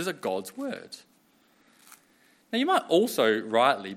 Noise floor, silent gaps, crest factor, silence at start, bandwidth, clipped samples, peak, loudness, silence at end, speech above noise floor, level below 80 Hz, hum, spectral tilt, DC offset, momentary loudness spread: -64 dBFS; none; 22 dB; 0 s; 16.5 kHz; under 0.1%; -6 dBFS; -26 LUFS; 0 s; 38 dB; -82 dBFS; none; -4 dB/octave; under 0.1%; 16 LU